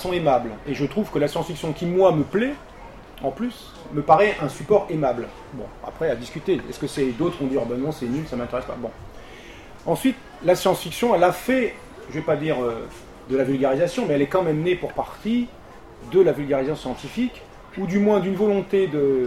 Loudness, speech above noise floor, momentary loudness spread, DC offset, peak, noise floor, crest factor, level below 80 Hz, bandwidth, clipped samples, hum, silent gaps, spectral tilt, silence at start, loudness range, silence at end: -23 LUFS; 19 dB; 18 LU; 0.1%; -2 dBFS; -41 dBFS; 22 dB; -48 dBFS; 16 kHz; under 0.1%; none; none; -6.5 dB/octave; 0 s; 4 LU; 0 s